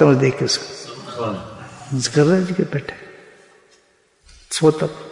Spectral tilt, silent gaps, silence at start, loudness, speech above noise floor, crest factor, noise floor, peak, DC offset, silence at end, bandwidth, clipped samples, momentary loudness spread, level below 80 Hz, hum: -5.5 dB/octave; none; 0 s; -19 LUFS; 40 dB; 18 dB; -58 dBFS; -2 dBFS; under 0.1%; 0 s; 11 kHz; under 0.1%; 18 LU; -56 dBFS; none